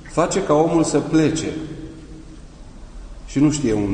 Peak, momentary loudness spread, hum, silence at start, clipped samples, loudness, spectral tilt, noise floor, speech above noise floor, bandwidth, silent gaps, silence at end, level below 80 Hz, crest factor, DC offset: -4 dBFS; 23 LU; none; 0 s; under 0.1%; -19 LUFS; -5.5 dB/octave; -39 dBFS; 21 dB; 9.8 kHz; none; 0 s; -38 dBFS; 16 dB; under 0.1%